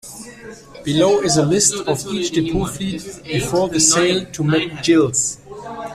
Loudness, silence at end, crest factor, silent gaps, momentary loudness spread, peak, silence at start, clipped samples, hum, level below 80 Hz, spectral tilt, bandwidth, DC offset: -17 LUFS; 0 s; 18 dB; none; 19 LU; 0 dBFS; 0.05 s; under 0.1%; none; -44 dBFS; -3.5 dB/octave; 14.5 kHz; under 0.1%